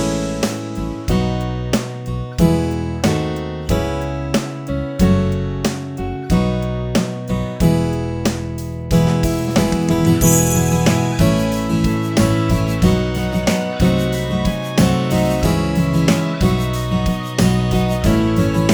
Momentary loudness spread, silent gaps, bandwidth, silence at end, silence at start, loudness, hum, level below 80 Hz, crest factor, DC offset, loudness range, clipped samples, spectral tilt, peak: 7 LU; none; over 20 kHz; 0 s; 0 s; -18 LUFS; none; -28 dBFS; 16 dB; under 0.1%; 4 LU; under 0.1%; -6 dB/octave; 0 dBFS